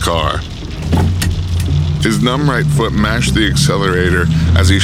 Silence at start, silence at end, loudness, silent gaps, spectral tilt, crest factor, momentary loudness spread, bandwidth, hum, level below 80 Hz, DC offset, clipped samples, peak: 0 s; 0 s; -14 LUFS; none; -5.5 dB/octave; 12 dB; 5 LU; 15 kHz; none; -22 dBFS; under 0.1%; under 0.1%; 0 dBFS